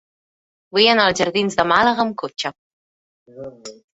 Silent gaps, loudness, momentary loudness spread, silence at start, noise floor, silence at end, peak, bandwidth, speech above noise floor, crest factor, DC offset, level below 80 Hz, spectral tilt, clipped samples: 2.58-3.26 s; -17 LUFS; 22 LU; 0.75 s; under -90 dBFS; 0.25 s; 0 dBFS; 8.2 kHz; over 72 dB; 20 dB; under 0.1%; -56 dBFS; -3.5 dB/octave; under 0.1%